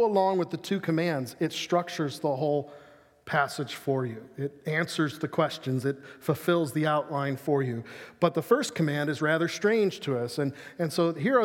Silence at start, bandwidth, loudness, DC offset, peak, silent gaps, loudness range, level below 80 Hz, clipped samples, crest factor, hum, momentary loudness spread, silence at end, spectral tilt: 0 s; 17 kHz; -28 LUFS; under 0.1%; -8 dBFS; none; 3 LU; -74 dBFS; under 0.1%; 20 dB; none; 8 LU; 0 s; -6 dB/octave